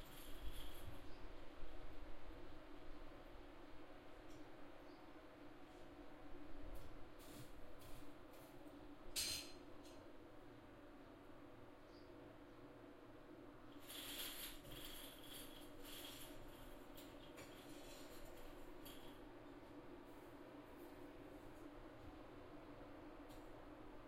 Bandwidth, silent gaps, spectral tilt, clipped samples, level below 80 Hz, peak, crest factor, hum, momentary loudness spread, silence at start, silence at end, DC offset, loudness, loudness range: 16 kHz; none; -3 dB/octave; under 0.1%; -62 dBFS; -32 dBFS; 22 dB; none; 9 LU; 0 s; 0 s; under 0.1%; -57 LUFS; 9 LU